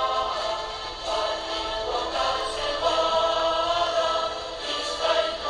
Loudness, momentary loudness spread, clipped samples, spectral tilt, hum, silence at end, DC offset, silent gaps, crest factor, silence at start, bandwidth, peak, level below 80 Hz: -25 LUFS; 7 LU; under 0.1%; -2 dB/octave; none; 0 s; under 0.1%; none; 16 dB; 0 s; 11 kHz; -10 dBFS; -48 dBFS